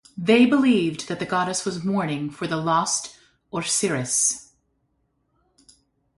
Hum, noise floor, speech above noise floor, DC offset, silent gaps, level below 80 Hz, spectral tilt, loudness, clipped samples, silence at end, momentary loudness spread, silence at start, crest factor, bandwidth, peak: none; -70 dBFS; 48 dB; under 0.1%; none; -62 dBFS; -3.5 dB/octave; -22 LUFS; under 0.1%; 1.75 s; 12 LU; 0.15 s; 18 dB; 11.5 kHz; -6 dBFS